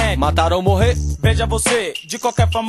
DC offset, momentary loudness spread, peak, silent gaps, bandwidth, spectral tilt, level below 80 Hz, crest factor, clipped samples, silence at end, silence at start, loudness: under 0.1%; 5 LU; 0 dBFS; none; 13 kHz; -4.5 dB/octave; -24 dBFS; 16 dB; under 0.1%; 0 s; 0 s; -17 LUFS